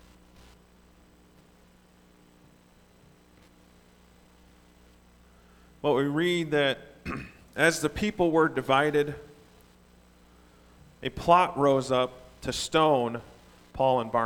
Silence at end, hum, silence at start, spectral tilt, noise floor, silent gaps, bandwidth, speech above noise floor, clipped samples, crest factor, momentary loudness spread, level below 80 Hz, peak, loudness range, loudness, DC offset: 0 s; 60 Hz at -60 dBFS; 5.85 s; -5 dB/octave; -58 dBFS; none; 19 kHz; 34 dB; under 0.1%; 24 dB; 15 LU; -54 dBFS; -6 dBFS; 4 LU; -26 LUFS; under 0.1%